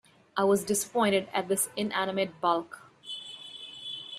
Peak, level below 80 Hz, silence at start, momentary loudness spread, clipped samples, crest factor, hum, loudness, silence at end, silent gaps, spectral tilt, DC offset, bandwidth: -12 dBFS; -72 dBFS; 0.35 s; 15 LU; under 0.1%; 18 dB; none; -29 LUFS; 0 s; none; -3 dB/octave; under 0.1%; 15.5 kHz